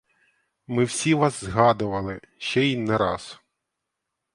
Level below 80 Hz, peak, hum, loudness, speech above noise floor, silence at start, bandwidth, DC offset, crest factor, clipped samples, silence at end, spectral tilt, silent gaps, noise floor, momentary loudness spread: -52 dBFS; -2 dBFS; none; -23 LUFS; 59 dB; 0.7 s; 11.5 kHz; under 0.1%; 22 dB; under 0.1%; 1 s; -5 dB/octave; none; -82 dBFS; 12 LU